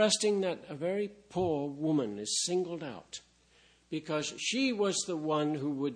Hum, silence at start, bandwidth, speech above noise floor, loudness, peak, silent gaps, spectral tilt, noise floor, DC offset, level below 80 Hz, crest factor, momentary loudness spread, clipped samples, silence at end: none; 0 s; 10.5 kHz; 32 dB; -32 LUFS; -14 dBFS; none; -3.5 dB/octave; -65 dBFS; under 0.1%; -70 dBFS; 18 dB; 12 LU; under 0.1%; 0 s